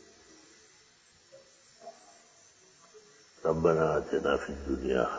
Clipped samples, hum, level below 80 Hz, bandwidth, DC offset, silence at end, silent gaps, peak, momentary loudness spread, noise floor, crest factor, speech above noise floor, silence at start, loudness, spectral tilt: under 0.1%; none; -52 dBFS; 8 kHz; under 0.1%; 0 s; none; -12 dBFS; 25 LU; -62 dBFS; 22 dB; 33 dB; 1.35 s; -30 LUFS; -6 dB/octave